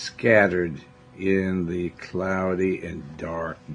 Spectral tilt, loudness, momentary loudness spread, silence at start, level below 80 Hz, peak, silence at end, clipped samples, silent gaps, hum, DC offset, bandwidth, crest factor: -6.5 dB/octave; -24 LUFS; 14 LU; 0 s; -56 dBFS; -4 dBFS; 0 s; under 0.1%; none; none; under 0.1%; 10 kHz; 20 dB